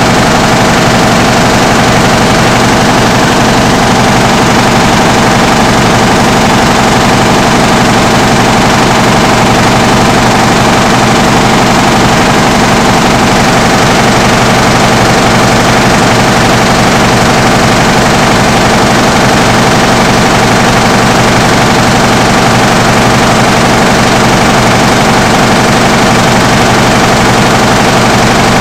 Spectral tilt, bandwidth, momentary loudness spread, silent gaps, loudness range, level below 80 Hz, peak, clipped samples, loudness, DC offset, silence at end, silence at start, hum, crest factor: -4 dB/octave; 16.5 kHz; 0 LU; none; 0 LU; -22 dBFS; 0 dBFS; 3%; -5 LUFS; 0.2%; 0 s; 0 s; none; 6 dB